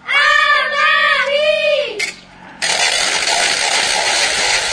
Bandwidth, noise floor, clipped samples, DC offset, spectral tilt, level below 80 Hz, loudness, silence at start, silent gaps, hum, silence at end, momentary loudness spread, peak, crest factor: 11 kHz; -37 dBFS; under 0.1%; under 0.1%; 1 dB/octave; -50 dBFS; -13 LUFS; 0.05 s; none; none; 0 s; 6 LU; 0 dBFS; 14 dB